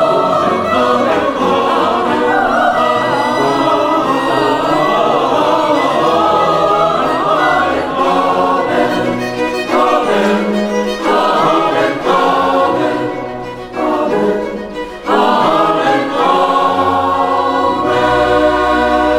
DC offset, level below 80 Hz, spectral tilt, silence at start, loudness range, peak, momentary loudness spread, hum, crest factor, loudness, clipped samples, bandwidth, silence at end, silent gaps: under 0.1%; -42 dBFS; -5 dB/octave; 0 s; 2 LU; 0 dBFS; 5 LU; none; 12 dB; -13 LUFS; under 0.1%; 17 kHz; 0 s; none